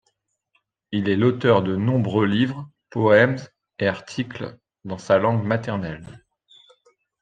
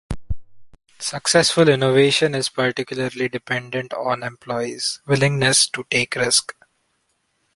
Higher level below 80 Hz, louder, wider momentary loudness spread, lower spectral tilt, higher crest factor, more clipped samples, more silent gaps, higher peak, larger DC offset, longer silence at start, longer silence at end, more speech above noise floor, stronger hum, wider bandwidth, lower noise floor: second, -60 dBFS vs -44 dBFS; about the same, -21 LUFS vs -19 LUFS; first, 18 LU vs 12 LU; first, -7.5 dB/octave vs -3.5 dB/octave; about the same, 20 dB vs 18 dB; neither; neither; about the same, -2 dBFS vs -2 dBFS; neither; first, 0.9 s vs 0.1 s; about the same, 1.05 s vs 1.05 s; about the same, 51 dB vs 49 dB; neither; second, 9 kHz vs 11.5 kHz; about the same, -72 dBFS vs -69 dBFS